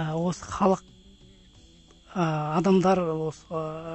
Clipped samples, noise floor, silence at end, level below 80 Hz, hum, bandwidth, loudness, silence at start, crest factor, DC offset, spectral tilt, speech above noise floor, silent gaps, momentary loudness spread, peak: under 0.1%; -54 dBFS; 0 s; -54 dBFS; none; 8.4 kHz; -26 LUFS; 0 s; 18 dB; under 0.1%; -7 dB/octave; 29 dB; none; 11 LU; -8 dBFS